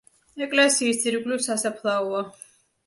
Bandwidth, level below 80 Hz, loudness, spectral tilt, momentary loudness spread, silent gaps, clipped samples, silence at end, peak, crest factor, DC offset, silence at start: 12 kHz; -72 dBFS; -23 LUFS; -2 dB/octave; 12 LU; none; under 0.1%; 0.55 s; -8 dBFS; 18 dB; under 0.1%; 0.35 s